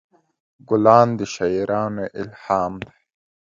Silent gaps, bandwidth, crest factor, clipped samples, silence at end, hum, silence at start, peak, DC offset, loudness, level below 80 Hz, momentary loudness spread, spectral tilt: none; 7.6 kHz; 20 dB; under 0.1%; 0.55 s; none; 0.7 s; 0 dBFS; under 0.1%; -19 LUFS; -54 dBFS; 17 LU; -6.5 dB/octave